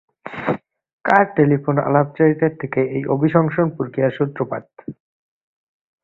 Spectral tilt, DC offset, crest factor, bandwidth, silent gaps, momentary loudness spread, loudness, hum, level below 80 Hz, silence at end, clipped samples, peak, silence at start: -10 dB/octave; under 0.1%; 18 dB; 5.2 kHz; 0.93-0.98 s; 13 LU; -19 LUFS; none; -58 dBFS; 1.1 s; under 0.1%; 0 dBFS; 0.25 s